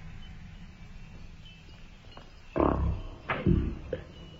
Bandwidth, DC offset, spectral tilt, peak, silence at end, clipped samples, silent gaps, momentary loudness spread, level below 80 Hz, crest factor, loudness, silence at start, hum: 7.4 kHz; under 0.1%; -8.5 dB/octave; -10 dBFS; 0 s; under 0.1%; none; 23 LU; -38 dBFS; 22 dB; -31 LUFS; 0 s; none